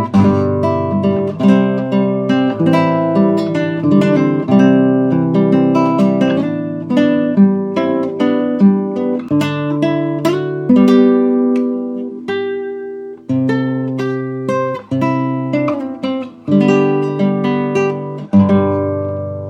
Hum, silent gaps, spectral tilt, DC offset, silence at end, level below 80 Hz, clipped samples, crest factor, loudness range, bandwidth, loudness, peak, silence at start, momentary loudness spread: none; none; -8.5 dB/octave; under 0.1%; 0 s; -60 dBFS; under 0.1%; 14 dB; 5 LU; 8.6 kHz; -14 LUFS; 0 dBFS; 0 s; 9 LU